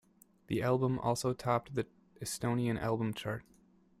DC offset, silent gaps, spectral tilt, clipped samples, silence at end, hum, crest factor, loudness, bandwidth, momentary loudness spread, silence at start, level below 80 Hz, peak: under 0.1%; none; -6 dB/octave; under 0.1%; 0.6 s; none; 18 dB; -35 LUFS; 15.5 kHz; 10 LU; 0.5 s; -62 dBFS; -16 dBFS